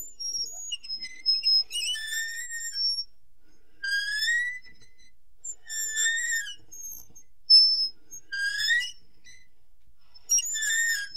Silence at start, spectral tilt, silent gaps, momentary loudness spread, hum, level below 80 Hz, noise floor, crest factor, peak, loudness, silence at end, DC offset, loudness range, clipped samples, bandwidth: 0 s; 4.5 dB/octave; none; 19 LU; none; -64 dBFS; -63 dBFS; 20 dB; -8 dBFS; -24 LUFS; 0 s; 0.7%; 7 LU; under 0.1%; 16 kHz